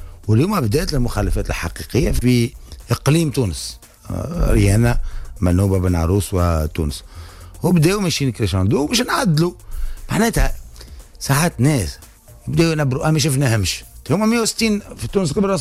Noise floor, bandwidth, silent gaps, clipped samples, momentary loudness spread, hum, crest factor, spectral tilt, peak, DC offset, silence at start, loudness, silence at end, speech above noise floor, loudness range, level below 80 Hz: -38 dBFS; 16 kHz; none; under 0.1%; 12 LU; none; 14 dB; -5.5 dB/octave; -4 dBFS; under 0.1%; 0 s; -18 LUFS; 0 s; 21 dB; 2 LU; -28 dBFS